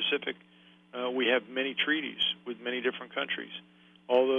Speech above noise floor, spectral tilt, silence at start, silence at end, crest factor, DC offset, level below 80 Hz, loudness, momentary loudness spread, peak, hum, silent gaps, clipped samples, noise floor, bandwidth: 25 dB; -5 dB/octave; 0 s; 0 s; 18 dB; under 0.1%; -78 dBFS; -30 LUFS; 13 LU; -12 dBFS; none; none; under 0.1%; -56 dBFS; 7 kHz